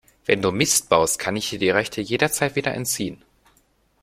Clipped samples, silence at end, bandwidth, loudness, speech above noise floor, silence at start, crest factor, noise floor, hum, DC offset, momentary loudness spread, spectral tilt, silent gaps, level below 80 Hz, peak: under 0.1%; 0.85 s; 16.5 kHz; -21 LUFS; 41 dB; 0.3 s; 20 dB; -62 dBFS; none; under 0.1%; 7 LU; -3 dB/octave; none; -54 dBFS; -2 dBFS